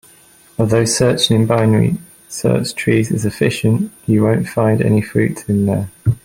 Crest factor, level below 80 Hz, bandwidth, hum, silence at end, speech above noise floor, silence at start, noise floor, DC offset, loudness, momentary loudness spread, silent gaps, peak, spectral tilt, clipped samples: 14 dB; -46 dBFS; 16 kHz; none; 0.05 s; 32 dB; 0.6 s; -47 dBFS; under 0.1%; -16 LUFS; 6 LU; none; -2 dBFS; -5.5 dB/octave; under 0.1%